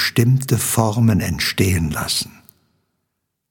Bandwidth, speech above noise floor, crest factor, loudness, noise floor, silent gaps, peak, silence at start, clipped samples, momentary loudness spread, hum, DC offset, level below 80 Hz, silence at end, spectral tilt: 17.5 kHz; 58 dB; 18 dB; -18 LUFS; -75 dBFS; none; -2 dBFS; 0 s; under 0.1%; 5 LU; none; under 0.1%; -40 dBFS; 1.2 s; -4.5 dB/octave